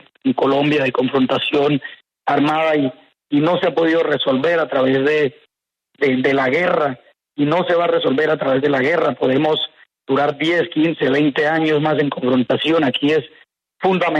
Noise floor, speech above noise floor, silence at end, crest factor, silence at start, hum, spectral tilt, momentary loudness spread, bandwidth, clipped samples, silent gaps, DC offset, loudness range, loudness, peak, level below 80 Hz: -67 dBFS; 50 dB; 0 s; 12 dB; 0.25 s; none; -7 dB/octave; 6 LU; 8.6 kHz; under 0.1%; none; under 0.1%; 1 LU; -17 LUFS; -4 dBFS; -62 dBFS